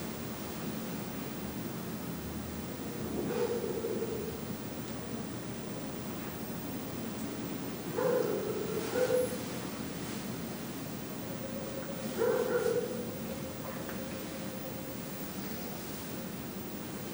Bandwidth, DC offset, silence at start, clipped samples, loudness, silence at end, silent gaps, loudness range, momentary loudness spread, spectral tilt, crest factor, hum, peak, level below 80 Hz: over 20 kHz; under 0.1%; 0 s; under 0.1%; -37 LUFS; 0 s; none; 5 LU; 8 LU; -5 dB/octave; 18 dB; none; -18 dBFS; -60 dBFS